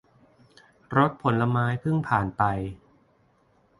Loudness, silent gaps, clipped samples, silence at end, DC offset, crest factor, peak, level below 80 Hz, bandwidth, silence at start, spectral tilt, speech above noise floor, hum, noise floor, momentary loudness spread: -25 LUFS; none; under 0.1%; 1.05 s; under 0.1%; 20 dB; -6 dBFS; -52 dBFS; 11 kHz; 0.9 s; -8.5 dB/octave; 39 dB; none; -64 dBFS; 4 LU